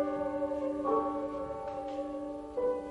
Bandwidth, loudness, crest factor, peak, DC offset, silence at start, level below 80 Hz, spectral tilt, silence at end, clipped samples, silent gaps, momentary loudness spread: 11 kHz; -35 LUFS; 16 dB; -18 dBFS; under 0.1%; 0 s; -60 dBFS; -7.5 dB/octave; 0 s; under 0.1%; none; 8 LU